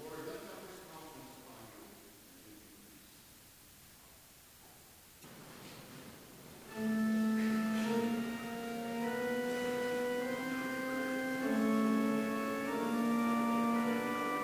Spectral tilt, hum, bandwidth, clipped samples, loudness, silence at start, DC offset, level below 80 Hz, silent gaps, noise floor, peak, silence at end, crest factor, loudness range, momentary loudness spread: -5 dB/octave; none; 16 kHz; under 0.1%; -35 LUFS; 0 s; under 0.1%; -70 dBFS; none; -59 dBFS; -22 dBFS; 0 s; 16 dB; 21 LU; 23 LU